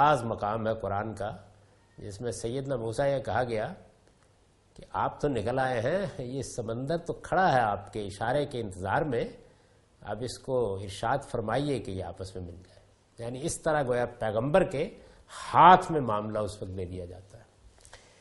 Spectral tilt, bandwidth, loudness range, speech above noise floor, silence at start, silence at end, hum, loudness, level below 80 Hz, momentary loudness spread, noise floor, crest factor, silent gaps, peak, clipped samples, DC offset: -5.5 dB/octave; 11.5 kHz; 8 LU; 35 dB; 0 s; 0.25 s; none; -29 LUFS; -54 dBFS; 15 LU; -63 dBFS; 26 dB; none; -4 dBFS; under 0.1%; under 0.1%